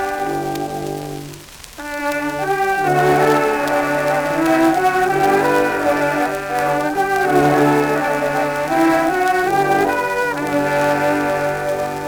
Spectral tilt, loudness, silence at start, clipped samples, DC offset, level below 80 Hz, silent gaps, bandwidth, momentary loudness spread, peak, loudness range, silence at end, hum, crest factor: -5 dB/octave; -17 LUFS; 0 s; under 0.1%; under 0.1%; -46 dBFS; none; over 20 kHz; 9 LU; -4 dBFS; 3 LU; 0 s; none; 14 dB